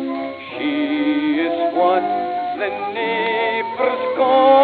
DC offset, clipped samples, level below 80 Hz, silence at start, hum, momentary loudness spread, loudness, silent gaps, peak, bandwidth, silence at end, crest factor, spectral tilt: under 0.1%; under 0.1%; -70 dBFS; 0 s; none; 7 LU; -19 LUFS; none; -2 dBFS; 4.7 kHz; 0 s; 16 dB; -7.5 dB/octave